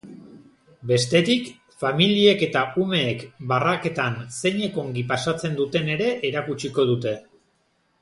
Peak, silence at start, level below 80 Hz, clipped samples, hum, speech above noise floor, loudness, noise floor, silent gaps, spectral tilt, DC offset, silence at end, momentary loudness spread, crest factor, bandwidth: -4 dBFS; 0.05 s; -60 dBFS; under 0.1%; none; 45 dB; -22 LUFS; -67 dBFS; none; -5 dB/octave; under 0.1%; 0.8 s; 10 LU; 20 dB; 11.5 kHz